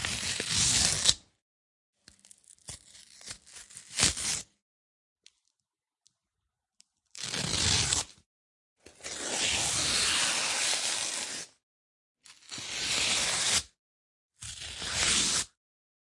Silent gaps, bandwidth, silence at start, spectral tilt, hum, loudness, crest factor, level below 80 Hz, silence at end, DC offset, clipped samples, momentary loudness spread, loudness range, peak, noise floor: 1.42-1.93 s, 4.62-5.16 s, 8.26-8.76 s, 11.63-12.15 s, 13.79-14.29 s; 11.5 kHz; 0 s; -0.5 dB/octave; none; -27 LUFS; 32 dB; -54 dBFS; 0.55 s; under 0.1%; under 0.1%; 21 LU; 6 LU; -2 dBFS; -88 dBFS